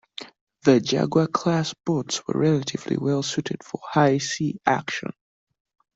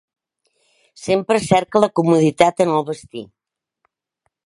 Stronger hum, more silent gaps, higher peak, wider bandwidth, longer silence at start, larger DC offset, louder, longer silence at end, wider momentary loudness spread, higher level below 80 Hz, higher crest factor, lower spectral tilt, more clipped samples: neither; first, 0.41-0.47 s vs none; second, -4 dBFS vs 0 dBFS; second, 8 kHz vs 11.5 kHz; second, 0.2 s vs 1 s; neither; second, -23 LUFS vs -17 LUFS; second, 0.85 s vs 1.2 s; second, 11 LU vs 16 LU; second, -62 dBFS vs -56 dBFS; about the same, 20 dB vs 20 dB; about the same, -5.5 dB/octave vs -6 dB/octave; neither